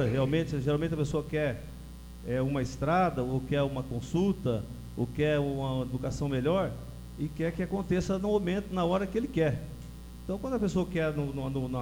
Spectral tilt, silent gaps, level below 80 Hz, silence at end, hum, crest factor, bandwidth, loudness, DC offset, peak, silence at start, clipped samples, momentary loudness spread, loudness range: -7 dB/octave; none; -46 dBFS; 0 s; 60 Hz at -45 dBFS; 16 dB; 19.5 kHz; -31 LUFS; under 0.1%; -14 dBFS; 0 s; under 0.1%; 12 LU; 1 LU